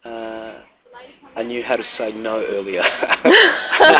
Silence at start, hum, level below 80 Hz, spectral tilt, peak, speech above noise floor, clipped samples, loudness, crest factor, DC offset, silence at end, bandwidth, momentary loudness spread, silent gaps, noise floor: 0.05 s; none; -58 dBFS; -6.5 dB/octave; 0 dBFS; 28 dB; 0.1%; -16 LUFS; 18 dB; under 0.1%; 0 s; 4 kHz; 20 LU; none; -44 dBFS